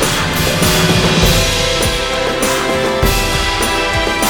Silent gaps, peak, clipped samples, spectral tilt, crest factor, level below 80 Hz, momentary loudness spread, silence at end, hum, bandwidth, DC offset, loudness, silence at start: none; 0 dBFS; under 0.1%; -3.5 dB/octave; 14 dB; -24 dBFS; 4 LU; 0 s; none; 19.5 kHz; under 0.1%; -13 LUFS; 0 s